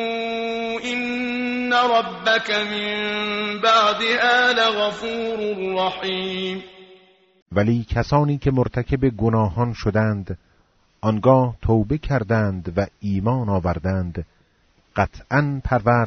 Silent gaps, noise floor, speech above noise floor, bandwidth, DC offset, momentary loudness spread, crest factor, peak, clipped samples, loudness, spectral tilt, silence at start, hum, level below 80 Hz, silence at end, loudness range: 7.42-7.46 s; -60 dBFS; 40 dB; 8 kHz; under 0.1%; 9 LU; 18 dB; -4 dBFS; under 0.1%; -21 LUFS; -4 dB/octave; 0 s; none; -40 dBFS; 0 s; 5 LU